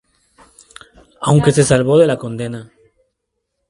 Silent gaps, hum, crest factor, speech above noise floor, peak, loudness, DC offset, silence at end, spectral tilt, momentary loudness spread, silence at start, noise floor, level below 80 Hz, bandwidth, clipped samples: none; none; 18 dB; 60 dB; 0 dBFS; -14 LUFS; under 0.1%; 1.05 s; -6 dB/octave; 14 LU; 1.2 s; -74 dBFS; -46 dBFS; 11.5 kHz; under 0.1%